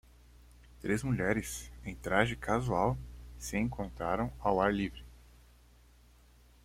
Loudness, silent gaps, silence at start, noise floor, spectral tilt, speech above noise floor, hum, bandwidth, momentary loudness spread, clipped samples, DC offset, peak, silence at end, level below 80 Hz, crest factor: -33 LUFS; none; 0.4 s; -61 dBFS; -5.5 dB/octave; 28 dB; 60 Hz at -45 dBFS; 16.5 kHz; 13 LU; under 0.1%; under 0.1%; -12 dBFS; 1.45 s; -50 dBFS; 24 dB